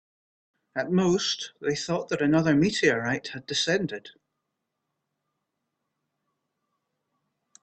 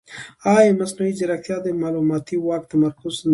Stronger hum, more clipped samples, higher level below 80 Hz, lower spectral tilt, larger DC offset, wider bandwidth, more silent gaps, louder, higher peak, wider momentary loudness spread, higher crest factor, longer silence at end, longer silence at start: neither; neither; about the same, -64 dBFS vs -60 dBFS; second, -4.5 dB/octave vs -6 dB/octave; neither; second, 9 kHz vs 11.5 kHz; neither; second, -26 LUFS vs -20 LUFS; second, -8 dBFS vs -2 dBFS; about the same, 11 LU vs 10 LU; about the same, 22 dB vs 18 dB; first, 3.55 s vs 0 s; first, 0.75 s vs 0.1 s